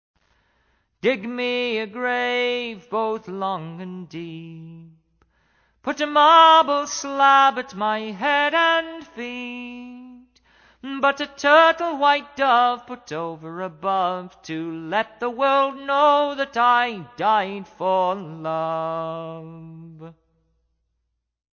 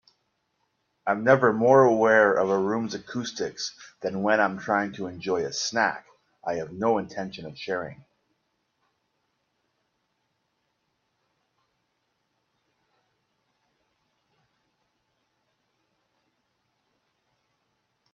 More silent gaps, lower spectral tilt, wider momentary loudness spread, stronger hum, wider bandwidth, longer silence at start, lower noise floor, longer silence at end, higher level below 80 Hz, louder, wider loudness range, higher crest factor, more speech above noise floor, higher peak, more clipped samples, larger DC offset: neither; about the same, -3.5 dB/octave vs -4.5 dB/octave; first, 20 LU vs 16 LU; neither; about the same, 7 kHz vs 7.4 kHz; about the same, 1.05 s vs 1.05 s; about the same, -76 dBFS vs -76 dBFS; second, 1.5 s vs 10.2 s; first, -64 dBFS vs -70 dBFS; first, -20 LUFS vs -24 LUFS; second, 10 LU vs 14 LU; second, 18 dB vs 26 dB; about the same, 55 dB vs 52 dB; about the same, -4 dBFS vs -2 dBFS; neither; neither